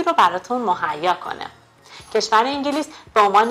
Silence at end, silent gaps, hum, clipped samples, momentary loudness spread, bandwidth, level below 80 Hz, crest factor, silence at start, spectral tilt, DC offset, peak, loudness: 0 s; none; none; under 0.1%; 11 LU; 15.5 kHz; -60 dBFS; 18 dB; 0 s; -3 dB/octave; under 0.1%; -2 dBFS; -19 LUFS